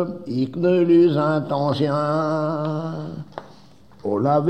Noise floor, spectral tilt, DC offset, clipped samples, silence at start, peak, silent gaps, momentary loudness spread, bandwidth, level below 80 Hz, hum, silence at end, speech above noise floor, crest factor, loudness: -49 dBFS; -8.5 dB/octave; 0.3%; under 0.1%; 0 s; -6 dBFS; none; 17 LU; 8.6 kHz; -62 dBFS; none; 0 s; 29 dB; 14 dB; -20 LUFS